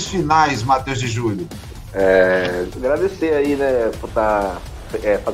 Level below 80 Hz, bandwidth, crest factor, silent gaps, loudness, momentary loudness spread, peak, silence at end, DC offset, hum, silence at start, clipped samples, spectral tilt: -36 dBFS; 16 kHz; 16 dB; none; -18 LUFS; 13 LU; -2 dBFS; 0 s; under 0.1%; none; 0 s; under 0.1%; -5.5 dB/octave